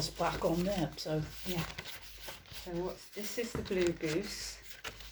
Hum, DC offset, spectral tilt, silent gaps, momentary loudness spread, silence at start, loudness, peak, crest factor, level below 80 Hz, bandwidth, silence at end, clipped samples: none; under 0.1%; -4.5 dB/octave; none; 12 LU; 0 s; -37 LUFS; -16 dBFS; 20 dB; -54 dBFS; over 20 kHz; 0 s; under 0.1%